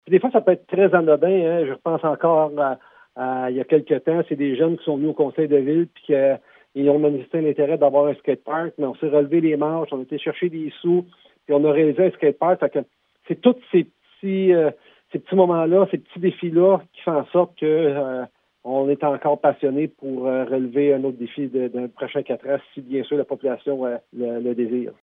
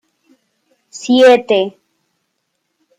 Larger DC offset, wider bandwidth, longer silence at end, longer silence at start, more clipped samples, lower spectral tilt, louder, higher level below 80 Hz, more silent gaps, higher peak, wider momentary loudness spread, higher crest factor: neither; second, 3.9 kHz vs 10 kHz; second, 0.1 s vs 1.3 s; second, 0.05 s vs 0.95 s; neither; first, -11 dB/octave vs -4 dB/octave; second, -21 LUFS vs -12 LUFS; second, -78 dBFS vs -68 dBFS; neither; about the same, -2 dBFS vs -2 dBFS; second, 10 LU vs 20 LU; about the same, 18 dB vs 14 dB